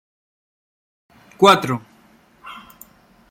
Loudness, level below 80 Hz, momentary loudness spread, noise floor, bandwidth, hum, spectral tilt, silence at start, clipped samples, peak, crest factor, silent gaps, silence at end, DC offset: -16 LUFS; -62 dBFS; 25 LU; -53 dBFS; 16.5 kHz; none; -4.5 dB/octave; 1.4 s; under 0.1%; 0 dBFS; 22 dB; none; 0.75 s; under 0.1%